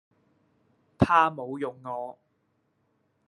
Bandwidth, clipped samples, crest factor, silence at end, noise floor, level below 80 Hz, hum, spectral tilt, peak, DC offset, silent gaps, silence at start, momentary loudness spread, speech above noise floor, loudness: 11.5 kHz; under 0.1%; 24 dB; 1.15 s; -73 dBFS; -54 dBFS; none; -7.5 dB/octave; -6 dBFS; under 0.1%; none; 1 s; 15 LU; 46 dB; -26 LUFS